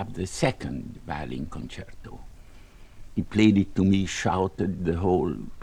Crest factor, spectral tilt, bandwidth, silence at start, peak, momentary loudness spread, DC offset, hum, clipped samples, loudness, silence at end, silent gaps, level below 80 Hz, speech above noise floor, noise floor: 22 dB; -6 dB/octave; 11.5 kHz; 0 s; -6 dBFS; 18 LU; under 0.1%; none; under 0.1%; -26 LUFS; 0 s; none; -44 dBFS; 21 dB; -47 dBFS